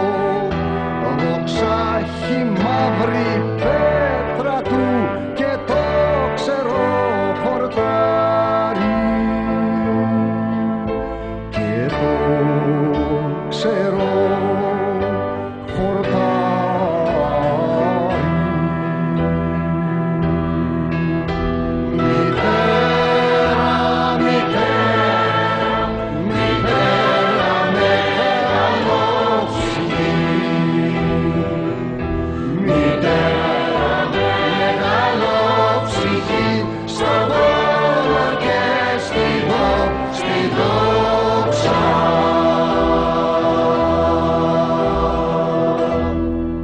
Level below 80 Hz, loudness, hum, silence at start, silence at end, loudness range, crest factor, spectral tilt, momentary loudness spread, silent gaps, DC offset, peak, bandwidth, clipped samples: -36 dBFS; -17 LUFS; none; 0 s; 0 s; 3 LU; 14 dB; -6.5 dB/octave; 5 LU; none; under 0.1%; -4 dBFS; 9.4 kHz; under 0.1%